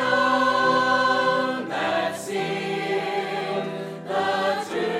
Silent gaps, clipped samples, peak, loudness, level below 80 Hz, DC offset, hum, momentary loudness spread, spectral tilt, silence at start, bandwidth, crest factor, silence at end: none; under 0.1%; -8 dBFS; -23 LUFS; -72 dBFS; under 0.1%; none; 8 LU; -4 dB/octave; 0 s; 15.5 kHz; 16 dB; 0 s